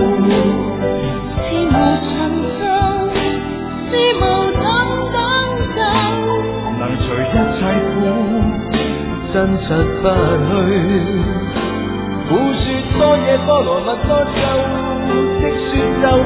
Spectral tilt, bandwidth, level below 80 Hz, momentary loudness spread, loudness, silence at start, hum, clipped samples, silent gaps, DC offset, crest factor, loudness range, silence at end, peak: -10.5 dB/octave; 4 kHz; -28 dBFS; 6 LU; -16 LUFS; 0 s; none; under 0.1%; none; under 0.1%; 14 dB; 2 LU; 0 s; 0 dBFS